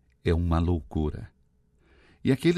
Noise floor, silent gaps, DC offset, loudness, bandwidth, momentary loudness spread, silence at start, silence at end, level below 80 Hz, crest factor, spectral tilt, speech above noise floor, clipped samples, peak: -64 dBFS; none; under 0.1%; -28 LUFS; 12.5 kHz; 13 LU; 0.25 s; 0 s; -42 dBFS; 18 dB; -8 dB/octave; 39 dB; under 0.1%; -10 dBFS